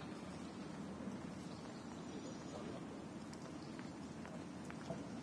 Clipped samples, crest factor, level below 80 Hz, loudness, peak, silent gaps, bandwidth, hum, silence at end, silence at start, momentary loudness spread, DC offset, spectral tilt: under 0.1%; 18 dB; -70 dBFS; -50 LUFS; -32 dBFS; none; 11 kHz; none; 0 s; 0 s; 2 LU; under 0.1%; -5.5 dB/octave